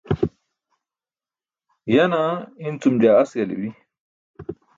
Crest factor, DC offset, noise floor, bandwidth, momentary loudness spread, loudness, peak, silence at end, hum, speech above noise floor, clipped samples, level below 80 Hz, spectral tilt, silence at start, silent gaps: 20 dB; under 0.1%; under -90 dBFS; 7.6 kHz; 20 LU; -20 LUFS; -4 dBFS; 0.25 s; none; over 71 dB; under 0.1%; -50 dBFS; -7.5 dB/octave; 0.05 s; 4.00-4.34 s